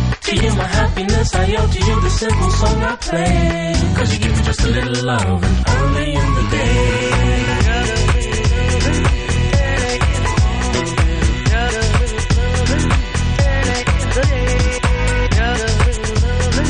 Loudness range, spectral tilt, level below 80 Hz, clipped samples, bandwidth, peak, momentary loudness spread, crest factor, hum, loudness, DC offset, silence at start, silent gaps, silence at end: 1 LU; -5 dB/octave; -18 dBFS; under 0.1%; 10.5 kHz; -2 dBFS; 2 LU; 14 dB; none; -16 LUFS; under 0.1%; 0 s; none; 0 s